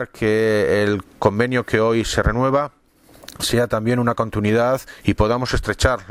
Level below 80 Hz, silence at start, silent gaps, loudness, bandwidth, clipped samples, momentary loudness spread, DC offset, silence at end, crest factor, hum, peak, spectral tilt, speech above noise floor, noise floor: -32 dBFS; 0 s; none; -19 LUFS; 16 kHz; under 0.1%; 5 LU; under 0.1%; 0 s; 18 dB; none; 0 dBFS; -5.5 dB/octave; 30 dB; -48 dBFS